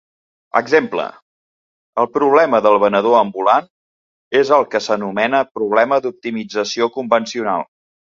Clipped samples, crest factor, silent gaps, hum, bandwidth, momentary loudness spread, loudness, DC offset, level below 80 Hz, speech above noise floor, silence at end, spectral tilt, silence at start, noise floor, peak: under 0.1%; 16 dB; 1.22-1.93 s, 3.70-4.31 s, 5.51-5.55 s; none; 7.6 kHz; 10 LU; -16 LUFS; under 0.1%; -64 dBFS; over 75 dB; 0.55 s; -4.5 dB/octave; 0.55 s; under -90 dBFS; 0 dBFS